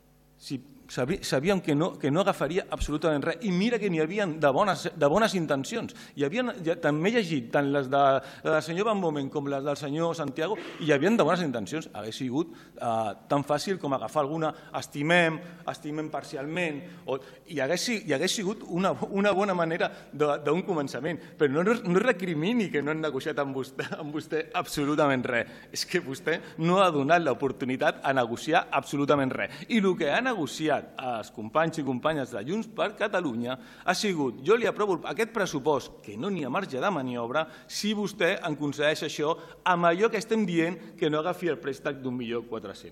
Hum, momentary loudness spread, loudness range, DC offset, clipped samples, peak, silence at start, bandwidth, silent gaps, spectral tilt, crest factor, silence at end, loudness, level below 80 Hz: none; 10 LU; 3 LU; under 0.1%; under 0.1%; -10 dBFS; 0.4 s; 16.5 kHz; none; -5 dB/octave; 18 dB; 0 s; -28 LUFS; -56 dBFS